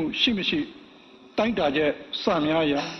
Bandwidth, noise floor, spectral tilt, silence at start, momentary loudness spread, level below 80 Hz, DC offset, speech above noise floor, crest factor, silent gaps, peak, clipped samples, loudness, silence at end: 6.4 kHz; -50 dBFS; -5 dB/octave; 0 s; 7 LU; -54 dBFS; under 0.1%; 26 dB; 18 dB; none; -8 dBFS; under 0.1%; -24 LUFS; 0 s